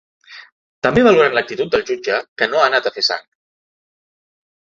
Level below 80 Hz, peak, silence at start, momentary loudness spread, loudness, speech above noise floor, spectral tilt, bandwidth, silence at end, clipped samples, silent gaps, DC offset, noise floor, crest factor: -50 dBFS; 0 dBFS; 0.3 s; 9 LU; -16 LUFS; over 74 dB; -4.5 dB/octave; 7.6 kHz; 1.5 s; under 0.1%; 0.52-0.82 s, 2.28-2.36 s; under 0.1%; under -90 dBFS; 18 dB